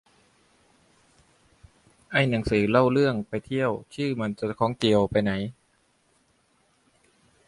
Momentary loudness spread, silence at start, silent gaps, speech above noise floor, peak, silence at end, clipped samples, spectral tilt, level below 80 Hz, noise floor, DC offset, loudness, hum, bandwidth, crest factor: 9 LU; 2.1 s; none; 43 dB; -6 dBFS; 1.95 s; under 0.1%; -7 dB/octave; -52 dBFS; -67 dBFS; under 0.1%; -25 LUFS; none; 11.5 kHz; 22 dB